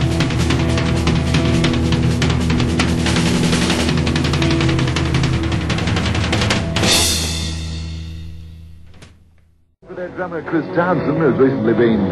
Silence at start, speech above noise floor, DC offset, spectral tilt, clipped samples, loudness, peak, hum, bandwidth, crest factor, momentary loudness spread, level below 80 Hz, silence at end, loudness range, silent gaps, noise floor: 0 s; 37 dB; under 0.1%; -5 dB/octave; under 0.1%; -17 LUFS; -2 dBFS; none; 14 kHz; 16 dB; 12 LU; -28 dBFS; 0 s; 8 LU; none; -53 dBFS